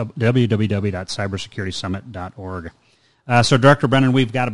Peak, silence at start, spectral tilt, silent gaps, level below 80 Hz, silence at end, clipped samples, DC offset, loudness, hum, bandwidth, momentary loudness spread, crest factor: 0 dBFS; 0 s; -6 dB/octave; none; -44 dBFS; 0 s; under 0.1%; under 0.1%; -18 LUFS; none; 11.5 kHz; 18 LU; 18 dB